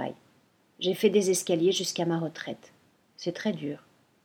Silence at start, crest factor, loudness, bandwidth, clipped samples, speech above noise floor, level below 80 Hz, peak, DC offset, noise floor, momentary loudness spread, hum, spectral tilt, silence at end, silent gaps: 0 s; 20 dB; -28 LUFS; 18.5 kHz; under 0.1%; 37 dB; -78 dBFS; -10 dBFS; under 0.1%; -65 dBFS; 15 LU; none; -4 dB/octave; 0.45 s; none